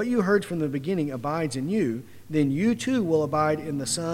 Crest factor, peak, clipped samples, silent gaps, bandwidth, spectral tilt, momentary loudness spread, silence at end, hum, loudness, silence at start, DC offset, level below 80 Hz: 16 dB; -10 dBFS; under 0.1%; none; 16 kHz; -5.5 dB/octave; 5 LU; 0 s; none; -26 LUFS; 0 s; under 0.1%; -60 dBFS